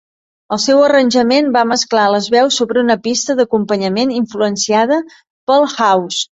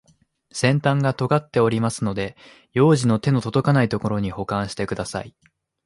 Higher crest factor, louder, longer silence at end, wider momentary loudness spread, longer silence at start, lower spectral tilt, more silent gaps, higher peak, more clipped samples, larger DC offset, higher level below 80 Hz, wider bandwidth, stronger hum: second, 12 dB vs 18 dB; first, -13 LUFS vs -21 LUFS; second, 0.1 s vs 0.55 s; second, 6 LU vs 11 LU; about the same, 0.5 s vs 0.55 s; second, -3.5 dB/octave vs -6.5 dB/octave; first, 5.30-5.47 s vs none; about the same, -2 dBFS vs -4 dBFS; neither; neither; second, -58 dBFS vs -50 dBFS; second, 8.2 kHz vs 11.5 kHz; neither